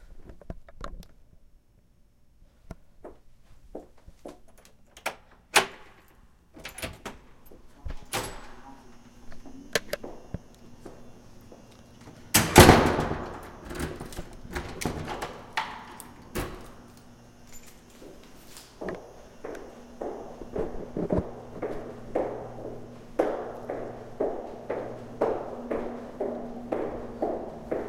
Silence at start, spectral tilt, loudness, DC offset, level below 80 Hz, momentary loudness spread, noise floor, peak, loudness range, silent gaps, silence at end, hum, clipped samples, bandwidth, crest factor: 0 s; -4 dB/octave; -28 LUFS; under 0.1%; -44 dBFS; 24 LU; -59 dBFS; 0 dBFS; 20 LU; none; 0 s; none; under 0.1%; 16.5 kHz; 30 dB